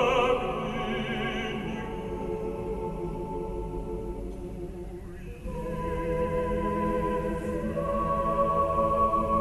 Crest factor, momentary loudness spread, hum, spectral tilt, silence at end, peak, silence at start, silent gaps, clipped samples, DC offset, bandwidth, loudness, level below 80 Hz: 16 dB; 14 LU; none; -6.5 dB/octave; 0 s; -14 dBFS; 0 s; none; under 0.1%; under 0.1%; 12.5 kHz; -30 LUFS; -40 dBFS